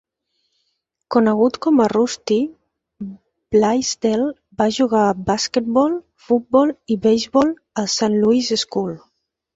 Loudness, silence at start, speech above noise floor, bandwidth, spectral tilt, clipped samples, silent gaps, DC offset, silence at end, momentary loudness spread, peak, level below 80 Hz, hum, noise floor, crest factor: -18 LUFS; 1.1 s; 55 dB; 8 kHz; -4.5 dB/octave; under 0.1%; none; under 0.1%; 0.55 s; 10 LU; -2 dBFS; -54 dBFS; none; -72 dBFS; 16 dB